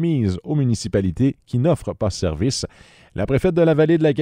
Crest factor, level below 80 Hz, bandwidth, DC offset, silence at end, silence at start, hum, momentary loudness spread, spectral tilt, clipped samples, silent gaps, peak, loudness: 16 dB; -40 dBFS; 11.5 kHz; under 0.1%; 0 s; 0 s; none; 9 LU; -6.5 dB/octave; under 0.1%; none; -4 dBFS; -20 LUFS